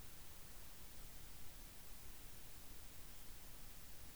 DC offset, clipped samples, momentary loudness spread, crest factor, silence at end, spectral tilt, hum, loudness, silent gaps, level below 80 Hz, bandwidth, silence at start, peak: 0.2%; under 0.1%; 0 LU; 14 dB; 0 s; -2.5 dB/octave; none; -55 LUFS; none; -60 dBFS; over 20 kHz; 0 s; -38 dBFS